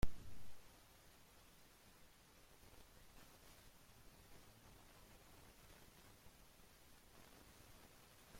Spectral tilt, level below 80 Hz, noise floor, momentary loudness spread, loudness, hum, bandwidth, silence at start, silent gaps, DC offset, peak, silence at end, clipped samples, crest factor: -4.5 dB/octave; -60 dBFS; -67 dBFS; 3 LU; -64 LUFS; none; 16.5 kHz; 0.05 s; none; under 0.1%; -24 dBFS; 0 s; under 0.1%; 26 dB